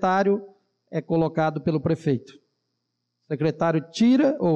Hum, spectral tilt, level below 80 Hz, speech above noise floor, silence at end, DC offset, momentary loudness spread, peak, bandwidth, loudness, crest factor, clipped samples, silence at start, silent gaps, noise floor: none; -7.5 dB/octave; -62 dBFS; 56 dB; 0 s; under 0.1%; 10 LU; -12 dBFS; 8.4 kHz; -24 LUFS; 12 dB; under 0.1%; 0 s; none; -78 dBFS